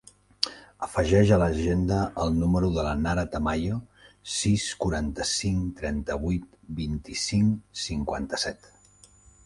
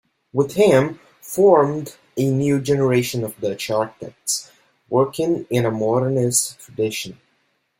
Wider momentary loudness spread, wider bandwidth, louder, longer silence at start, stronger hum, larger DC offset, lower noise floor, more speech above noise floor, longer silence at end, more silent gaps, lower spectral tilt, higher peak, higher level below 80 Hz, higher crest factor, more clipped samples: second, 10 LU vs 13 LU; second, 11.5 kHz vs 16.5 kHz; second, -27 LUFS vs -20 LUFS; about the same, 0.4 s vs 0.35 s; first, 50 Hz at -45 dBFS vs none; neither; second, -56 dBFS vs -67 dBFS; second, 30 dB vs 48 dB; first, 0.9 s vs 0.65 s; neither; about the same, -5.5 dB/octave vs -5 dB/octave; about the same, -4 dBFS vs -2 dBFS; first, -38 dBFS vs -58 dBFS; first, 24 dB vs 18 dB; neither